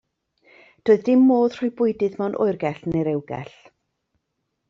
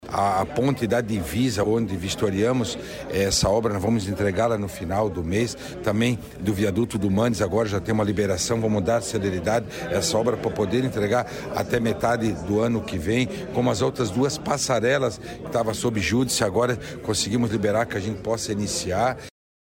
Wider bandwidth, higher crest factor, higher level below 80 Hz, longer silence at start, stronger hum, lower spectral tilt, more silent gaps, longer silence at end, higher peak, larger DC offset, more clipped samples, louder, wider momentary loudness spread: second, 6.8 kHz vs 16.5 kHz; about the same, 18 dB vs 14 dB; second, -60 dBFS vs -46 dBFS; first, 0.85 s vs 0 s; neither; first, -7.5 dB/octave vs -5 dB/octave; neither; first, 1.25 s vs 0.4 s; first, -4 dBFS vs -10 dBFS; neither; neither; first, -21 LUFS vs -24 LUFS; first, 13 LU vs 5 LU